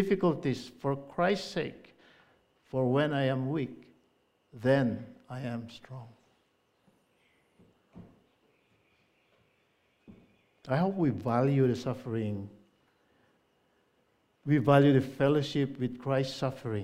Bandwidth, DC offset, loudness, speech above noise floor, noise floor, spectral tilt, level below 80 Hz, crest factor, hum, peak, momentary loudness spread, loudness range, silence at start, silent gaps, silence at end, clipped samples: 11.5 kHz; under 0.1%; -30 LUFS; 43 dB; -72 dBFS; -7.5 dB/octave; -68 dBFS; 22 dB; none; -8 dBFS; 15 LU; 8 LU; 0 s; none; 0 s; under 0.1%